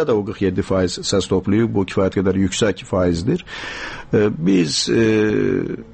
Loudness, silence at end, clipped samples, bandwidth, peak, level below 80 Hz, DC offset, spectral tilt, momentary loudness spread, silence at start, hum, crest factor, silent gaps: -19 LUFS; 0 s; under 0.1%; 8.8 kHz; -6 dBFS; -44 dBFS; under 0.1%; -5.5 dB/octave; 7 LU; 0 s; none; 12 dB; none